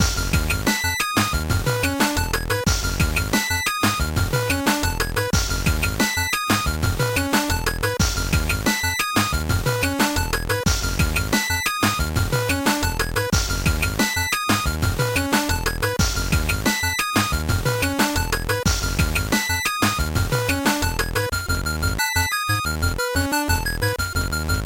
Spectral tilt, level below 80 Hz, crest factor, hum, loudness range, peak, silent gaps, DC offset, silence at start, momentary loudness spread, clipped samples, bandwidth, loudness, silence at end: -3.5 dB/octave; -28 dBFS; 16 dB; none; 1 LU; -6 dBFS; none; under 0.1%; 0 s; 3 LU; under 0.1%; 17 kHz; -21 LUFS; 0 s